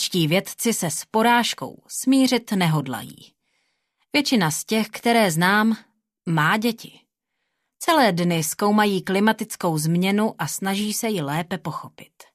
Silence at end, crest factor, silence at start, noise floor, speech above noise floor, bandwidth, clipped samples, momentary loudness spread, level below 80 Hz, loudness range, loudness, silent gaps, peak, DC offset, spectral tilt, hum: 0.3 s; 18 dB; 0 s; -78 dBFS; 56 dB; 14 kHz; under 0.1%; 12 LU; -66 dBFS; 2 LU; -21 LUFS; none; -4 dBFS; under 0.1%; -4.5 dB/octave; none